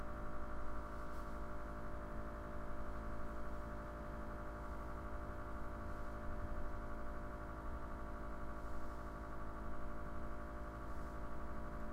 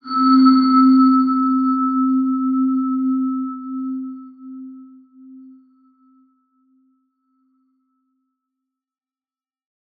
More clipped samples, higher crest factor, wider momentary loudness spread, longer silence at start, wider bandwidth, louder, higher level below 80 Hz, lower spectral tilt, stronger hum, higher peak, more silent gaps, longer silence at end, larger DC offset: neither; second, 12 dB vs 18 dB; second, 1 LU vs 24 LU; about the same, 0 s vs 0.05 s; first, 9.4 kHz vs 4.8 kHz; second, -49 LUFS vs -16 LUFS; first, -48 dBFS vs -84 dBFS; about the same, -7.5 dB/octave vs -7.5 dB/octave; neither; second, -32 dBFS vs -2 dBFS; neither; second, 0 s vs 4.6 s; neither